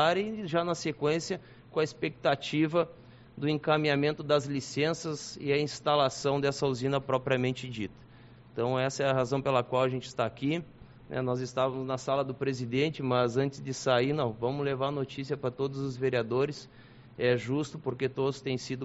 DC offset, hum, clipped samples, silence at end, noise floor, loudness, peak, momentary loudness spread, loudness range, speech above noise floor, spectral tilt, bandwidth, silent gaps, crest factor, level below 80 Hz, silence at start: under 0.1%; none; under 0.1%; 0 s; -53 dBFS; -30 LUFS; -10 dBFS; 8 LU; 3 LU; 23 dB; -4.5 dB/octave; 8 kHz; none; 20 dB; -62 dBFS; 0 s